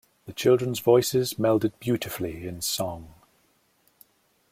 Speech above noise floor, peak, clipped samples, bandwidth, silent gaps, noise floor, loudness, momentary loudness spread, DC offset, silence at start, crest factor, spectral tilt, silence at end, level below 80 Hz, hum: 42 dB; -8 dBFS; under 0.1%; 16.5 kHz; none; -66 dBFS; -25 LUFS; 12 LU; under 0.1%; 0.25 s; 20 dB; -5 dB/octave; 1.4 s; -58 dBFS; none